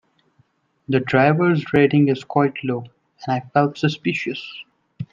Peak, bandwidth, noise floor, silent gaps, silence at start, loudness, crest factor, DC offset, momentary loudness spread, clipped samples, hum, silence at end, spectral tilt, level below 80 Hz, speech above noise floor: -2 dBFS; 7.4 kHz; -62 dBFS; none; 0.9 s; -19 LUFS; 18 dB; under 0.1%; 15 LU; under 0.1%; none; 0.1 s; -7.5 dB/octave; -58 dBFS; 43 dB